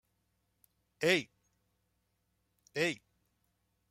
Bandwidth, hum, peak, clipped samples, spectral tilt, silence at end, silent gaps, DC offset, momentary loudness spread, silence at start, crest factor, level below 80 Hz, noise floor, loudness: 16 kHz; none; -14 dBFS; under 0.1%; -4 dB/octave; 0.95 s; none; under 0.1%; 16 LU; 1 s; 26 dB; -78 dBFS; -80 dBFS; -33 LUFS